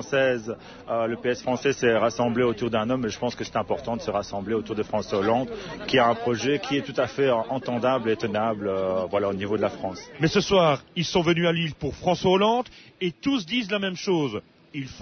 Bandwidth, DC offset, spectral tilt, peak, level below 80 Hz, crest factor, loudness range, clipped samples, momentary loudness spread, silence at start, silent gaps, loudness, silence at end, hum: 6.6 kHz; under 0.1%; -5.5 dB/octave; -8 dBFS; -54 dBFS; 16 dB; 3 LU; under 0.1%; 9 LU; 0 s; none; -25 LUFS; 0 s; none